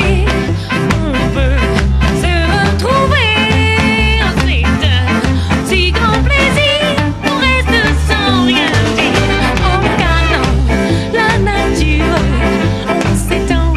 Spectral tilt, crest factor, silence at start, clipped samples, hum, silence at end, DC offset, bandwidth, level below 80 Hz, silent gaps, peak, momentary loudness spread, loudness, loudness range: -5.5 dB/octave; 10 dB; 0 s; under 0.1%; none; 0 s; under 0.1%; 13.5 kHz; -18 dBFS; none; 0 dBFS; 4 LU; -12 LUFS; 1 LU